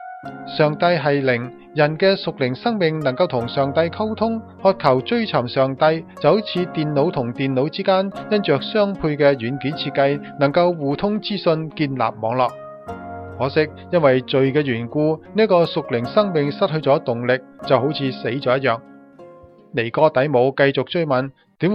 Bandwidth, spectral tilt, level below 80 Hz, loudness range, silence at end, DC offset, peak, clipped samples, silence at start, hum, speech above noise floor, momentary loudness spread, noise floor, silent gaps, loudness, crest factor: 5.8 kHz; -8.5 dB/octave; -56 dBFS; 2 LU; 0 s; under 0.1%; 0 dBFS; under 0.1%; 0 s; none; 25 dB; 7 LU; -44 dBFS; none; -19 LUFS; 20 dB